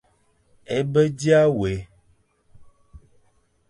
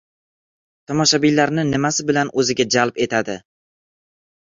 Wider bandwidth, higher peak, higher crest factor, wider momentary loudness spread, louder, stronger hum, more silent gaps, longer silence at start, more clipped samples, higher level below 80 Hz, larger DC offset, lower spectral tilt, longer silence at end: first, 11 kHz vs 7.8 kHz; second, -6 dBFS vs -2 dBFS; about the same, 18 dB vs 18 dB; first, 11 LU vs 8 LU; second, -21 LUFS vs -18 LUFS; neither; neither; second, 0.7 s vs 0.9 s; neither; first, -50 dBFS vs -56 dBFS; neither; first, -6.5 dB/octave vs -3.5 dB/octave; second, 0.7 s vs 1 s